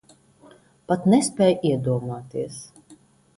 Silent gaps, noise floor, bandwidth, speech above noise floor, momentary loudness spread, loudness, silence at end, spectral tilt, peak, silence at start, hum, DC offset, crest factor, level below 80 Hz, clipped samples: none; -53 dBFS; 11.5 kHz; 32 dB; 13 LU; -22 LUFS; 0.45 s; -6 dB/octave; -6 dBFS; 0.9 s; none; under 0.1%; 18 dB; -60 dBFS; under 0.1%